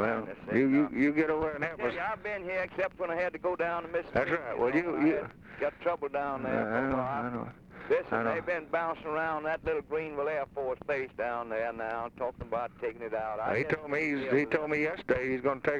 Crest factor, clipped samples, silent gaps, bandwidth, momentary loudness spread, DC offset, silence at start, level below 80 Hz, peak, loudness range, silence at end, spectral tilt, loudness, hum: 18 dB; under 0.1%; none; 7.6 kHz; 8 LU; under 0.1%; 0 s; -58 dBFS; -14 dBFS; 3 LU; 0 s; -7.5 dB/octave; -32 LUFS; none